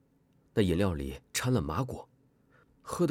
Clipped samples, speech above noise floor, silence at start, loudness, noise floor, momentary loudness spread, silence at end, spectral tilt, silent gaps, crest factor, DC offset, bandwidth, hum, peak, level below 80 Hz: under 0.1%; 37 dB; 0.55 s; -32 LUFS; -67 dBFS; 13 LU; 0 s; -5.5 dB/octave; none; 18 dB; under 0.1%; 16.5 kHz; none; -14 dBFS; -48 dBFS